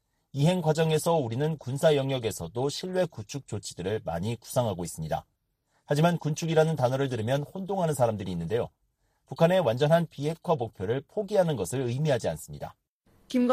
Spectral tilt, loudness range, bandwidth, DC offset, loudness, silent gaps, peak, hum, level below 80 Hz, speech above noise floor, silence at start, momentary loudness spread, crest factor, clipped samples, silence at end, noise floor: -6 dB/octave; 4 LU; 15.5 kHz; under 0.1%; -28 LUFS; 12.88-13.00 s; -10 dBFS; none; -58 dBFS; 46 dB; 0.35 s; 10 LU; 18 dB; under 0.1%; 0 s; -73 dBFS